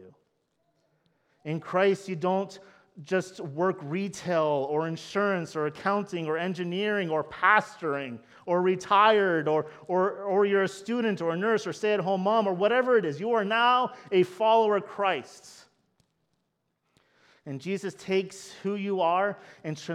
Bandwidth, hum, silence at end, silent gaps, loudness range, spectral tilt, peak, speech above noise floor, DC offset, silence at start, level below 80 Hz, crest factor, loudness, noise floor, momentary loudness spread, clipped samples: 12 kHz; none; 0 s; none; 7 LU; -5.5 dB/octave; -8 dBFS; 51 dB; under 0.1%; 0 s; -76 dBFS; 20 dB; -27 LUFS; -78 dBFS; 11 LU; under 0.1%